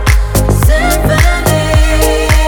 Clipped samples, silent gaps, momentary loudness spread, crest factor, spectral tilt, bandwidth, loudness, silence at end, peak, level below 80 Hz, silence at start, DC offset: under 0.1%; none; 2 LU; 8 dB; -5 dB/octave; 19.5 kHz; -10 LUFS; 0 s; 0 dBFS; -12 dBFS; 0 s; under 0.1%